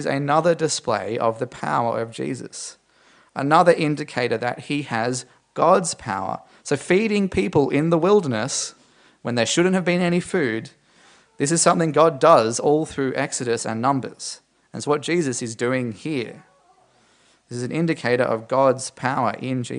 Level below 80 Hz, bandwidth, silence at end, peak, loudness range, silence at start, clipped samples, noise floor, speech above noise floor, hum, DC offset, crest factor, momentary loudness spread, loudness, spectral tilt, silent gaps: -58 dBFS; 10.5 kHz; 0 s; 0 dBFS; 6 LU; 0 s; under 0.1%; -58 dBFS; 38 dB; none; under 0.1%; 20 dB; 13 LU; -21 LUFS; -4.5 dB/octave; none